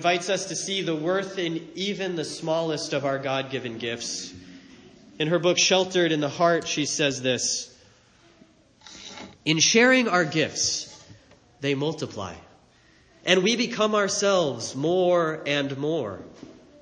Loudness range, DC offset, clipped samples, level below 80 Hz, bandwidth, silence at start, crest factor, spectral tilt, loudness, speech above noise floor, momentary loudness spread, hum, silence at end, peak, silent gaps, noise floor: 5 LU; under 0.1%; under 0.1%; -66 dBFS; 10.5 kHz; 0 s; 22 dB; -3 dB/octave; -24 LUFS; 33 dB; 13 LU; none; 0.3 s; -4 dBFS; none; -58 dBFS